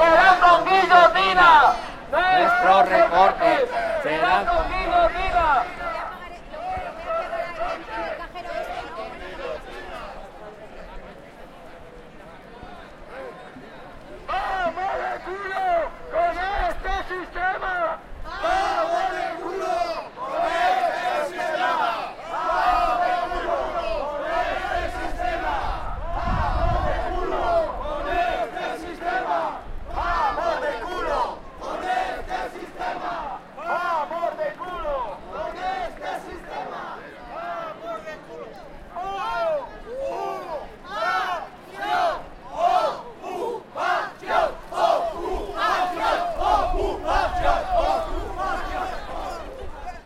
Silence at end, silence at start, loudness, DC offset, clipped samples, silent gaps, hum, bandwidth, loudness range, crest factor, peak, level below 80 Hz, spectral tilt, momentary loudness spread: 0 s; 0 s; -23 LUFS; under 0.1%; under 0.1%; none; none; 14 kHz; 13 LU; 22 dB; 0 dBFS; -38 dBFS; -4.5 dB/octave; 20 LU